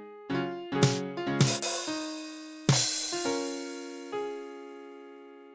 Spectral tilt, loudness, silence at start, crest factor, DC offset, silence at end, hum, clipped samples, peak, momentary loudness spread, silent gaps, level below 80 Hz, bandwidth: -4 dB/octave; -30 LUFS; 0 s; 20 dB; under 0.1%; 0 s; none; under 0.1%; -10 dBFS; 19 LU; none; -64 dBFS; 8 kHz